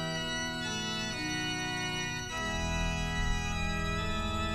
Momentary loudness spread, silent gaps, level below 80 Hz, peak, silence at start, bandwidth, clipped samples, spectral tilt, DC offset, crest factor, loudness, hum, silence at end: 1 LU; none; -40 dBFS; -18 dBFS; 0 s; 14 kHz; under 0.1%; -3.5 dB/octave; under 0.1%; 14 dB; -33 LUFS; none; 0 s